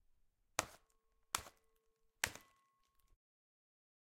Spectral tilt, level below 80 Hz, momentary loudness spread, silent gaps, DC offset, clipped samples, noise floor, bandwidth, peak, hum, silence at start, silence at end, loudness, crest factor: -0.5 dB/octave; -74 dBFS; 15 LU; none; under 0.1%; under 0.1%; -79 dBFS; 16.5 kHz; -10 dBFS; none; 0.6 s; 1.7 s; -44 LUFS; 42 dB